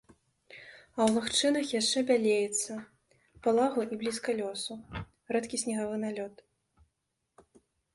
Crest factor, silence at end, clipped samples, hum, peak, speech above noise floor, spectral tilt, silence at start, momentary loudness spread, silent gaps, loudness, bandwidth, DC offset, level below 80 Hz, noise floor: 18 dB; 1.65 s; under 0.1%; none; -14 dBFS; 52 dB; -3 dB/octave; 0.5 s; 17 LU; none; -30 LUFS; 11.5 kHz; under 0.1%; -64 dBFS; -82 dBFS